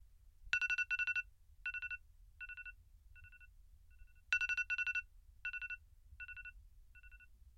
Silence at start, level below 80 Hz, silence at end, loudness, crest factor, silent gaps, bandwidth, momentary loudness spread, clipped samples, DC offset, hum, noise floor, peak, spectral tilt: 0 s; -62 dBFS; 0.05 s; -40 LUFS; 24 dB; none; 16.5 kHz; 24 LU; under 0.1%; under 0.1%; none; -62 dBFS; -20 dBFS; 0.5 dB/octave